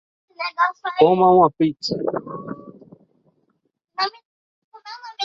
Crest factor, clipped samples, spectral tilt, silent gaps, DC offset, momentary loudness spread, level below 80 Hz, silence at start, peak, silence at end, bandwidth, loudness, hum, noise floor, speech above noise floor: 22 dB; under 0.1%; -6 dB/octave; 4.25-4.72 s; under 0.1%; 22 LU; -62 dBFS; 0.4 s; 0 dBFS; 0 s; 7.6 kHz; -19 LUFS; none; -70 dBFS; 53 dB